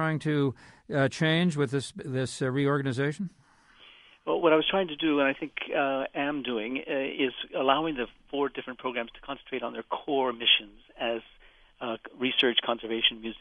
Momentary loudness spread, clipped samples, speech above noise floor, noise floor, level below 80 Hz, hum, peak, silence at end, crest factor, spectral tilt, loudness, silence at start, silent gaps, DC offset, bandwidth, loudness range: 12 LU; under 0.1%; 28 dB; -57 dBFS; -62 dBFS; none; -8 dBFS; 0.05 s; 22 dB; -5.5 dB/octave; -28 LUFS; 0 s; none; under 0.1%; 11.5 kHz; 3 LU